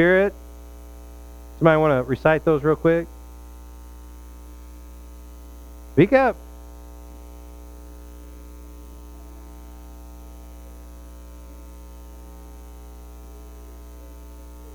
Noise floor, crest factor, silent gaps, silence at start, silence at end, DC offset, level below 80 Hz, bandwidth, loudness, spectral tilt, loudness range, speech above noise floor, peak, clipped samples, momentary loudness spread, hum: -40 dBFS; 22 dB; none; 0 s; 0 s; under 0.1%; -40 dBFS; over 20 kHz; -19 LUFS; -7.5 dB/octave; 21 LU; 23 dB; -2 dBFS; under 0.1%; 24 LU; 60 Hz at -40 dBFS